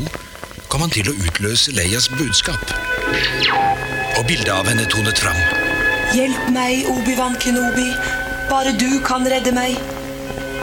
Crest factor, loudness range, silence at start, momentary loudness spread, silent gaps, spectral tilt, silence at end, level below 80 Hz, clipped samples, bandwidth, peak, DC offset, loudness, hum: 16 dB; 2 LU; 0 s; 8 LU; none; -3 dB/octave; 0 s; -34 dBFS; under 0.1%; 18 kHz; -2 dBFS; under 0.1%; -17 LUFS; none